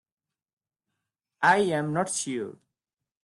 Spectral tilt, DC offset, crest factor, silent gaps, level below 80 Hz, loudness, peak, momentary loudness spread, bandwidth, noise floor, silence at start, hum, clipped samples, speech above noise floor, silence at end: -4 dB/octave; under 0.1%; 22 dB; none; -72 dBFS; -26 LUFS; -8 dBFS; 12 LU; 12.5 kHz; -87 dBFS; 1.4 s; none; under 0.1%; 62 dB; 0.7 s